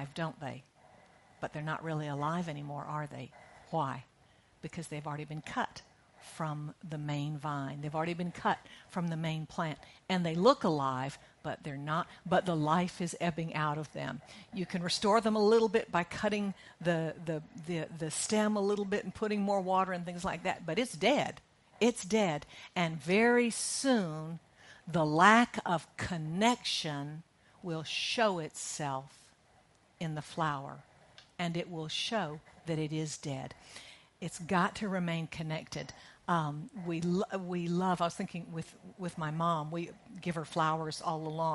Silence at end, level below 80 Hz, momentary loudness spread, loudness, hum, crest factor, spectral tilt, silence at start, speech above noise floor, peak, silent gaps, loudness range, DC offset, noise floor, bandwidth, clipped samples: 0 s; -68 dBFS; 15 LU; -34 LUFS; none; 26 dB; -5 dB/octave; 0 s; 32 dB; -8 dBFS; none; 9 LU; under 0.1%; -66 dBFS; 11.5 kHz; under 0.1%